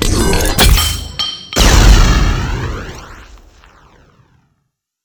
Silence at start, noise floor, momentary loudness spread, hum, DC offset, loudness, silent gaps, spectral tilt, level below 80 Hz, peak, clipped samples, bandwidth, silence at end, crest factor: 0 s; -68 dBFS; 15 LU; none; under 0.1%; -12 LUFS; none; -3.5 dB/octave; -14 dBFS; 0 dBFS; 0.4%; over 20 kHz; 1.8 s; 12 dB